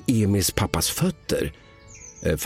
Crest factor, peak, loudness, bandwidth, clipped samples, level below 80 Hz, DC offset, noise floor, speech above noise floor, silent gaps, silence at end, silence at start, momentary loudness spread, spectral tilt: 22 dB; -2 dBFS; -24 LUFS; 16.5 kHz; under 0.1%; -40 dBFS; under 0.1%; -45 dBFS; 22 dB; none; 0 s; 0 s; 13 LU; -4.5 dB/octave